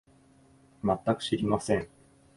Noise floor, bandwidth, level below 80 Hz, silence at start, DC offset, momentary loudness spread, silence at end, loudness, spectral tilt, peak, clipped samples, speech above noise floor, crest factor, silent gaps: -60 dBFS; 11.5 kHz; -56 dBFS; 0.85 s; under 0.1%; 5 LU; 0.5 s; -29 LUFS; -6 dB/octave; -10 dBFS; under 0.1%; 32 dB; 20 dB; none